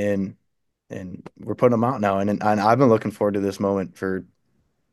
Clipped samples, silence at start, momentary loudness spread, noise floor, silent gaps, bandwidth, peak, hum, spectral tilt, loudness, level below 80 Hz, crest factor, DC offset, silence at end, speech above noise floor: under 0.1%; 0 s; 18 LU; -69 dBFS; none; 12.5 kHz; -4 dBFS; none; -7.5 dB/octave; -21 LUFS; -66 dBFS; 20 dB; under 0.1%; 0.7 s; 47 dB